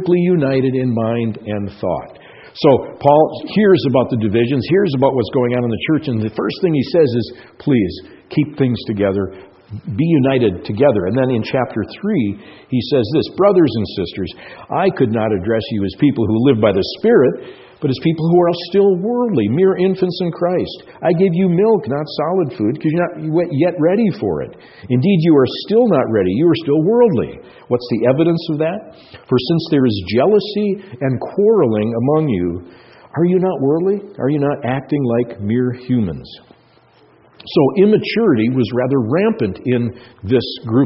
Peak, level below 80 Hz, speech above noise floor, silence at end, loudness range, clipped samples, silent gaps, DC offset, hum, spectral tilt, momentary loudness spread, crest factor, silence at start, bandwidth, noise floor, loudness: 0 dBFS; -50 dBFS; 35 dB; 0 s; 3 LU; under 0.1%; none; under 0.1%; none; -6.5 dB/octave; 9 LU; 16 dB; 0 s; 6 kHz; -50 dBFS; -16 LUFS